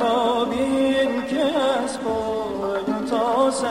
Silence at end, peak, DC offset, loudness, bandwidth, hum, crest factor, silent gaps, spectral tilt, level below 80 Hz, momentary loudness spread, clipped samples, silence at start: 0 s; -8 dBFS; 0.2%; -22 LUFS; 13.5 kHz; none; 12 dB; none; -4 dB/octave; -52 dBFS; 5 LU; under 0.1%; 0 s